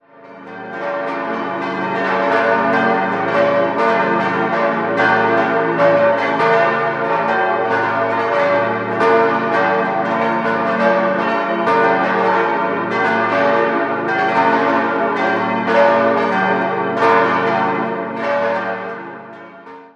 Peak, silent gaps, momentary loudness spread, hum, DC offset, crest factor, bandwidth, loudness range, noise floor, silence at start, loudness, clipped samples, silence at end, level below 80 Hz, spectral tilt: -2 dBFS; none; 8 LU; none; under 0.1%; 16 dB; 8.6 kHz; 2 LU; -38 dBFS; 0.2 s; -16 LUFS; under 0.1%; 0.1 s; -68 dBFS; -6.5 dB/octave